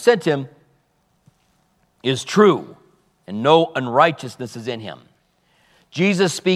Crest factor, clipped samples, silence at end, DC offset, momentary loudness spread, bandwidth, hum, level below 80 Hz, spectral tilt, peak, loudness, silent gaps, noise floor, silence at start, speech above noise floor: 20 dB; under 0.1%; 0 s; under 0.1%; 17 LU; 14 kHz; none; -70 dBFS; -5 dB/octave; 0 dBFS; -18 LUFS; none; -64 dBFS; 0 s; 46 dB